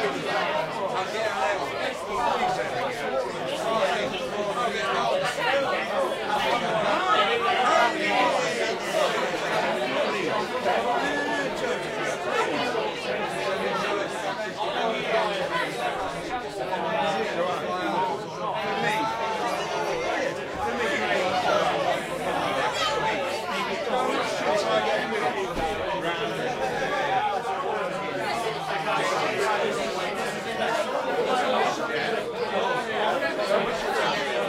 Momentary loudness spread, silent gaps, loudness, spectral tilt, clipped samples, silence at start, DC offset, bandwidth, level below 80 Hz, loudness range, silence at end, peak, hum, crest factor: 5 LU; none; -26 LUFS; -3.5 dB/octave; under 0.1%; 0 s; under 0.1%; 16 kHz; -56 dBFS; 4 LU; 0 s; -8 dBFS; none; 18 dB